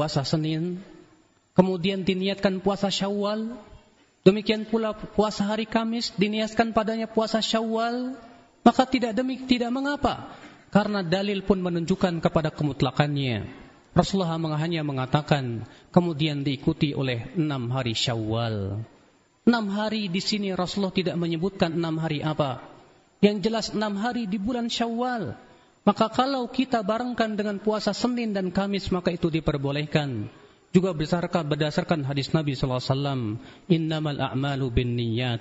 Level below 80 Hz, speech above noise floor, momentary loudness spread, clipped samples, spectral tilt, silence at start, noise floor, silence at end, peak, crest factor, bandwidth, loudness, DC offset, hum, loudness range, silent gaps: -48 dBFS; 35 dB; 5 LU; under 0.1%; -5 dB/octave; 0 s; -60 dBFS; 0 s; -2 dBFS; 22 dB; 8 kHz; -26 LUFS; under 0.1%; none; 2 LU; none